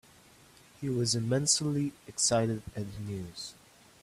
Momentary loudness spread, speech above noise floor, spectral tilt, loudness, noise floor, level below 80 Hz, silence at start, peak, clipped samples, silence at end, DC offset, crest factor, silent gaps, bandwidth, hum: 14 LU; 27 dB; -4 dB/octave; -30 LUFS; -58 dBFS; -60 dBFS; 0.8 s; -12 dBFS; under 0.1%; 0.5 s; under 0.1%; 22 dB; none; 15 kHz; none